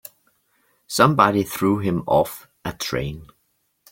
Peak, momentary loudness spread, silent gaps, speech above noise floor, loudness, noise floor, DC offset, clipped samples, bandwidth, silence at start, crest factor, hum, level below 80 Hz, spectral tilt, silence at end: -2 dBFS; 16 LU; none; 49 dB; -20 LUFS; -69 dBFS; under 0.1%; under 0.1%; 17 kHz; 0.9 s; 20 dB; none; -50 dBFS; -5.5 dB/octave; 0.65 s